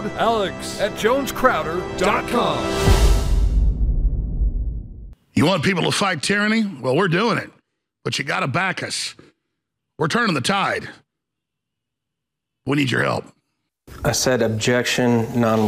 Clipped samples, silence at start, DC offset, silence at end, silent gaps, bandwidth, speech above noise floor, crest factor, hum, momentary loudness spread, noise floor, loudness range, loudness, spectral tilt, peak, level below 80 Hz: under 0.1%; 0 s; under 0.1%; 0 s; none; 16 kHz; 62 dB; 18 dB; none; 8 LU; -82 dBFS; 5 LU; -20 LUFS; -4.5 dB/octave; -2 dBFS; -26 dBFS